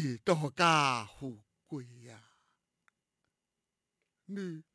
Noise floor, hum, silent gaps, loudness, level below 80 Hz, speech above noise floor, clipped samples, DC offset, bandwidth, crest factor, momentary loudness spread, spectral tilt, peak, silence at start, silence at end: -88 dBFS; none; none; -30 LUFS; -74 dBFS; 55 dB; under 0.1%; under 0.1%; 11 kHz; 22 dB; 20 LU; -4.5 dB/octave; -14 dBFS; 0 s; 0.15 s